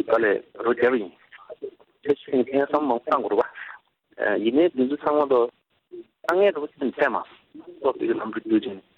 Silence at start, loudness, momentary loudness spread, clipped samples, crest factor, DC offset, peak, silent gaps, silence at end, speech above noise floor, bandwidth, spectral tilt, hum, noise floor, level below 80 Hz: 0 s; -23 LUFS; 18 LU; under 0.1%; 20 dB; under 0.1%; -4 dBFS; none; 0.2 s; 24 dB; 6.8 kHz; -7 dB/octave; none; -47 dBFS; -68 dBFS